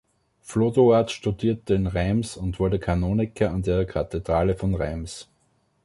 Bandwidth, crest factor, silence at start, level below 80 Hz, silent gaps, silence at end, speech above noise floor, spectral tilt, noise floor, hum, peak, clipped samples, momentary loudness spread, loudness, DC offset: 11.5 kHz; 18 dB; 0.45 s; -38 dBFS; none; 0.6 s; 44 dB; -7 dB/octave; -67 dBFS; none; -6 dBFS; under 0.1%; 11 LU; -24 LUFS; under 0.1%